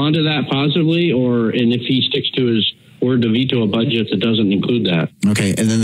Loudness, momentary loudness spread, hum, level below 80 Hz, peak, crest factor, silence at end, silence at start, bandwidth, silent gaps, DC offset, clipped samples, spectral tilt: -16 LUFS; 2 LU; none; -60 dBFS; -2 dBFS; 14 dB; 0 s; 0 s; 14 kHz; none; under 0.1%; under 0.1%; -5.5 dB/octave